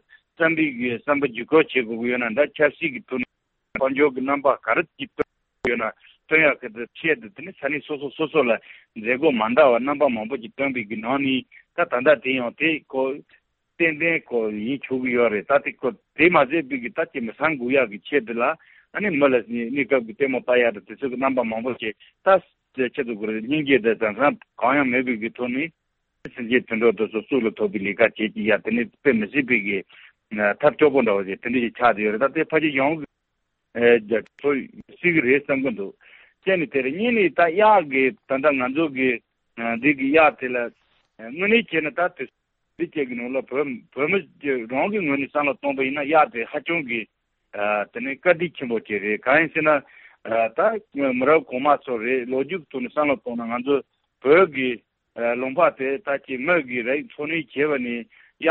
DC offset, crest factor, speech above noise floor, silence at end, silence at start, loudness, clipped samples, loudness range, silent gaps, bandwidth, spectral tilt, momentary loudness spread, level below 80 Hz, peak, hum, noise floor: under 0.1%; 20 dB; 54 dB; 0 s; 0.4 s; -22 LUFS; under 0.1%; 3 LU; none; 4.4 kHz; -3.5 dB/octave; 11 LU; -64 dBFS; -4 dBFS; none; -76 dBFS